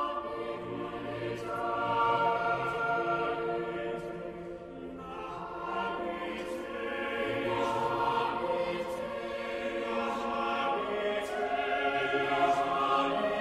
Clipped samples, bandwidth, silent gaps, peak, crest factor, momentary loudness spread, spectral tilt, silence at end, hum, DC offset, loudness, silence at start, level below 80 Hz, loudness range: under 0.1%; 14 kHz; none; -16 dBFS; 16 dB; 11 LU; -5 dB/octave; 0 s; none; under 0.1%; -32 LUFS; 0 s; -60 dBFS; 6 LU